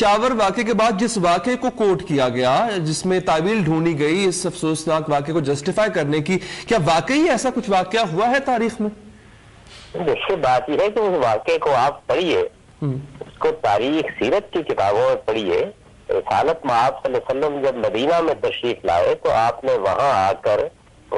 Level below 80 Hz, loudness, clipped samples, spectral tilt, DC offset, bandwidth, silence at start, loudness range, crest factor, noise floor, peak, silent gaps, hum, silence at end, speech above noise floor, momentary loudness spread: -50 dBFS; -19 LUFS; under 0.1%; -5 dB/octave; under 0.1%; 11.5 kHz; 0 s; 2 LU; 12 dB; -46 dBFS; -8 dBFS; none; none; 0 s; 27 dB; 6 LU